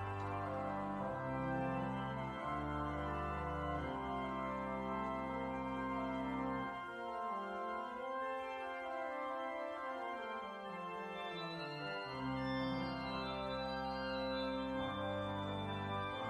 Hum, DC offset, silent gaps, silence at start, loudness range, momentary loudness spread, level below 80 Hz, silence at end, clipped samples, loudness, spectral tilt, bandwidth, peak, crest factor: none; under 0.1%; none; 0 s; 3 LU; 4 LU; -58 dBFS; 0 s; under 0.1%; -42 LUFS; -7 dB/octave; 12 kHz; -28 dBFS; 14 dB